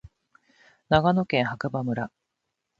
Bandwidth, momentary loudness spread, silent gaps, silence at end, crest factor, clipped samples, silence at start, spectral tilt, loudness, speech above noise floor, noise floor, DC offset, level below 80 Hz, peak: 7.6 kHz; 10 LU; none; 0.7 s; 22 dB; under 0.1%; 0.9 s; -7.5 dB/octave; -25 LUFS; 57 dB; -81 dBFS; under 0.1%; -52 dBFS; -4 dBFS